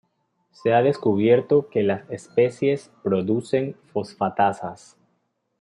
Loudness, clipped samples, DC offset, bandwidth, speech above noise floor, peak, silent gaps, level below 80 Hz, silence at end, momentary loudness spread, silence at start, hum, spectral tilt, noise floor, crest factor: -22 LUFS; under 0.1%; under 0.1%; 11 kHz; 50 dB; -6 dBFS; none; -68 dBFS; 0.85 s; 11 LU; 0.65 s; none; -7.5 dB/octave; -72 dBFS; 18 dB